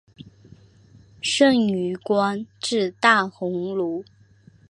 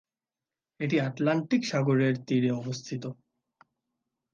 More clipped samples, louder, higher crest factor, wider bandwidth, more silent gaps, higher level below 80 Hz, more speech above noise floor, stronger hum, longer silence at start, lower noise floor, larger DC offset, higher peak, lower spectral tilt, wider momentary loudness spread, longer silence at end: neither; first, -21 LUFS vs -28 LUFS; about the same, 22 dB vs 18 dB; first, 11.5 kHz vs 7.6 kHz; neither; first, -64 dBFS vs -76 dBFS; second, 32 dB vs over 63 dB; neither; second, 0.2 s vs 0.8 s; second, -53 dBFS vs under -90 dBFS; neither; first, -2 dBFS vs -12 dBFS; second, -4 dB/octave vs -6.5 dB/octave; about the same, 11 LU vs 11 LU; second, 0.7 s vs 1.2 s